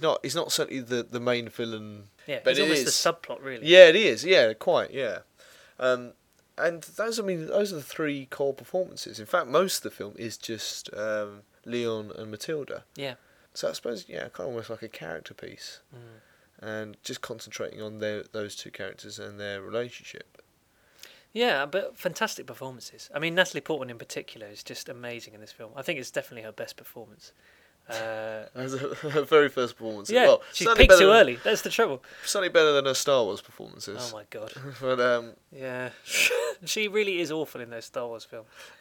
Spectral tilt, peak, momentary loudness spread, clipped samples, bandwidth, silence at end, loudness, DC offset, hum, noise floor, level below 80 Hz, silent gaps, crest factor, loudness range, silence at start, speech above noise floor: -3 dB/octave; 0 dBFS; 19 LU; under 0.1%; 18.5 kHz; 0.15 s; -25 LUFS; under 0.1%; none; -65 dBFS; -42 dBFS; none; 26 dB; 17 LU; 0 s; 38 dB